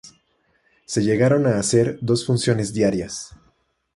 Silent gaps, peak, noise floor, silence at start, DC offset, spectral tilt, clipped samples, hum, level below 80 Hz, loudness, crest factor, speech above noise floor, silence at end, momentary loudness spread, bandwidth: none; -4 dBFS; -65 dBFS; 0.05 s; under 0.1%; -5.5 dB/octave; under 0.1%; none; -52 dBFS; -20 LUFS; 18 dB; 45 dB; 0.7 s; 11 LU; 11.5 kHz